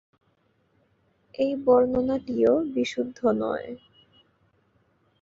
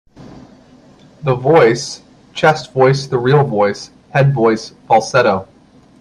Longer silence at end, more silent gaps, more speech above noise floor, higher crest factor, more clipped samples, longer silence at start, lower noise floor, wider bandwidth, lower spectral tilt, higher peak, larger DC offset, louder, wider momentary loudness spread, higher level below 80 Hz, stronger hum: first, 1.45 s vs 0.55 s; neither; first, 44 dB vs 31 dB; first, 20 dB vs 14 dB; neither; first, 1.4 s vs 0.2 s; first, -68 dBFS vs -44 dBFS; second, 7.6 kHz vs 10.5 kHz; about the same, -6 dB/octave vs -6 dB/octave; second, -8 dBFS vs 0 dBFS; neither; second, -24 LUFS vs -14 LUFS; first, 15 LU vs 12 LU; second, -58 dBFS vs -52 dBFS; neither